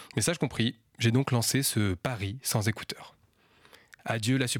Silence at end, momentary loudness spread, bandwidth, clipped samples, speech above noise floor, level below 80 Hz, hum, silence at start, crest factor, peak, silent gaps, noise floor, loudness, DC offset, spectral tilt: 0 s; 10 LU; 18.5 kHz; under 0.1%; 34 dB; -60 dBFS; none; 0 s; 18 dB; -12 dBFS; none; -62 dBFS; -29 LUFS; under 0.1%; -4.5 dB/octave